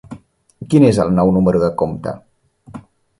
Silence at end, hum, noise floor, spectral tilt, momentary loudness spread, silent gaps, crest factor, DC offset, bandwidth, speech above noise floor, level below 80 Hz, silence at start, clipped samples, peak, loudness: 0.4 s; none; -38 dBFS; -8 dB/octave; 15 LU; none; 16 dB; under 0.1%; 11.5 kHz; 24 dB; -42 dBFS; 0.1 s; under 0.1%; 0 dBFS; -15 LUFS